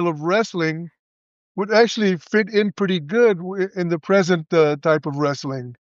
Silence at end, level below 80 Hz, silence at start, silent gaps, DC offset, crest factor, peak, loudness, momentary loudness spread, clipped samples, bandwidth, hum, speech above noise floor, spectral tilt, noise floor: 0.2 s; -72 dBFS; 0 s; 0.99-1.55 s; under 0.1%; 18 dB; -2 dBFS; -20 LUFS; 11 LU; under 0.1%; 7.6 kHz; none; over 71 dB; -6 dB/octave; under -90 dBFS